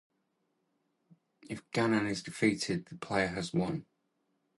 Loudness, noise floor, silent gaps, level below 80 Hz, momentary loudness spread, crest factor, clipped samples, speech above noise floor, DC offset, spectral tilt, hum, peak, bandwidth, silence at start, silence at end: -33 LUFS; -79 dBFS; none; -64 dBFS; 10 LU; 22 dB; under 0.1%; 47 dB; under 0.1%; -5 dB/octave; none; -14 dBFS; 11.5 kHz; 1.5 s; 0.75 s